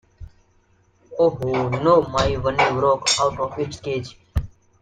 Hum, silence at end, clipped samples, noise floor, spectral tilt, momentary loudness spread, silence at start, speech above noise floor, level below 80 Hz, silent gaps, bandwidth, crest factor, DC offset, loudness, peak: none; 0.35 s; under 0.1%; -60 dBFS; -4 dB/octave; 12 LU; 0.2 s; 40 dB; -40 dBFS; none; 9.6 kHz; 18 dB; under 0.1%; -21 LUFS; -4 dBFS